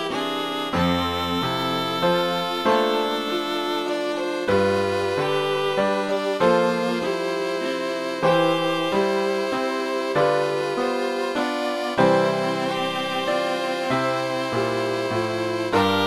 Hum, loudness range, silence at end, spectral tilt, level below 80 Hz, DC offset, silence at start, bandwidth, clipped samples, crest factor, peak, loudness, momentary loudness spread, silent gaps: none; 1 LU; 0 s; -5 dB/octave; -56 dBFS; under 0.1%; 0 s; 14.5 kHz; under 0.1%; 16 dB; -6 dBFS; -23 LUFS; 5 LU; none